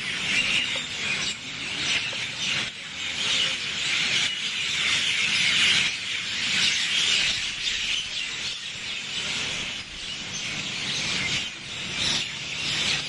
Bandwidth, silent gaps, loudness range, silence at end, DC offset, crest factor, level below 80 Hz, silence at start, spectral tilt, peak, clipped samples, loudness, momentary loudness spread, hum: 11.5 kHz; none; 6 LU; 0 s; under 0.1%; 18 dB; -56 dBFS; 0 s; 0 dB/octave; -8 dBFS; under 0.1%; -24 LUFS; 10 LU; none